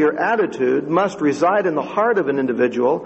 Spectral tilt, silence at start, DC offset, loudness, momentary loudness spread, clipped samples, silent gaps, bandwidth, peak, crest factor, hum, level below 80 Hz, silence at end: -6.5 dB/octave; 0 s; under 0.1%; -18 LUFS; 3 LU; under 0.1%; none; 8.4 kHz; -4 dBFS; 14 dB; none; -62 dBFS; 0 s